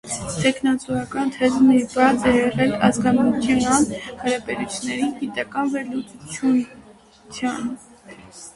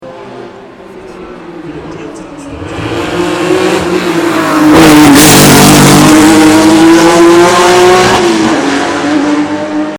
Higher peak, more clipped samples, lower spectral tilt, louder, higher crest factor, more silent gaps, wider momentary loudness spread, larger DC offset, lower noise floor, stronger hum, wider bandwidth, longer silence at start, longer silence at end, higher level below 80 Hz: about the same, -2 dBFS vs 0 dBFS; second, under 0.1% vs 6%; about the same, -4.5 dB/octave vs -4 dB/octave; second, -20 LUFS vs -5 LUFS; first, 20 dB vs 6 dB; neither; second, 13 LU vs 23 LU; neither; first, -48 dBFS vs -29 dBFS; neither; second, 11.5 kHz vs over 20 kHz; about the same, 0.05 s vs 0 s; about the same, 0.05 s vs 0 s; second, -50 dBFS vs -32 dBFS